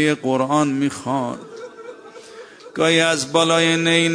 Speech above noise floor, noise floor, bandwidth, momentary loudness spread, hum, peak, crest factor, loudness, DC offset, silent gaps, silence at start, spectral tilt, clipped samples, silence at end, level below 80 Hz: 22 dB; -40 dBFS; 10.5 kHz; 23 LU; none; -2 dBFS; 18 dB; -18 LUFS; under 0.1%; none; 0 s; -4 dB/octave; under 0.1%; 0 s; -64 dBFS